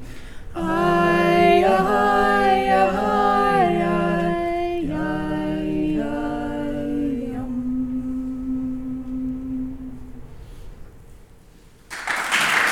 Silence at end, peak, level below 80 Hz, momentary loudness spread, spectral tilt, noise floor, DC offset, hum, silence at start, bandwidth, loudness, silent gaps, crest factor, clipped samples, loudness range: 0 s; -4 dBFS; -40 dBFS; 13 LU; -5.5 dB/octave; -48 dBFS; under 0.1%; none; 0 s; 17.5 kHz; -21 LUFS; none; 18 dB; under 0.1%; 13 LU